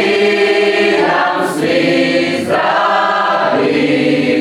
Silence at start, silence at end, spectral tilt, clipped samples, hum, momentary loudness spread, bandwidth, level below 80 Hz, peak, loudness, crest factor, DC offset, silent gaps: 0 s; 0 s; -5 dB/octave; under 0.1%; none; 3 LU; 14 kHz; -62 dBFS; -2 dBFS; -12 LUFS; 12 dB; under 0.1%; none